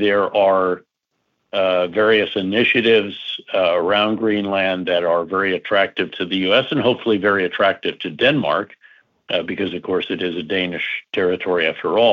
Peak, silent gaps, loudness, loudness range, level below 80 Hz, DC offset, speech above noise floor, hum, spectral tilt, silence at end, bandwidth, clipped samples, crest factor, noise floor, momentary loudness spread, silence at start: -4 dBFS; none; -18 LUFS; 4 LU; -62 dBFS; under 0.1%; 54 dB; none; -6.5 dB/octave; 0 s; 6.8 kHz; under 0.1%; 14 dB; -72 dBFS; 8 LU; 0 s